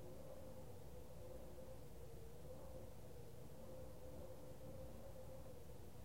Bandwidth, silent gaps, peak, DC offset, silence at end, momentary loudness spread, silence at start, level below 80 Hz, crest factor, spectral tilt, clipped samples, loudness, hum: 16 kHz; none; -42 dBFS; 0.2%; 0 s; 2 LU; 0 s; -64 dBFS; 14 dB; -6 dB/octave; under 0.1%; -58 LUFS; none